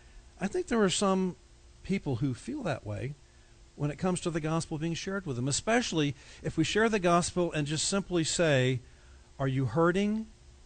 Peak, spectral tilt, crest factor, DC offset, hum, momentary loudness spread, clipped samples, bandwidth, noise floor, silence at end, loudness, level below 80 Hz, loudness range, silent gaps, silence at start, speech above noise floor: -14 dBFS; -5 dB/octave; 16 dB; under 0.1%; none; 10 LU; under 0.1%; 9.4 kHz; -57 dBFS; 0.3 s; -30 LUFS; -54 dBFS; 6 LU; none; 0.15 s; 27 dB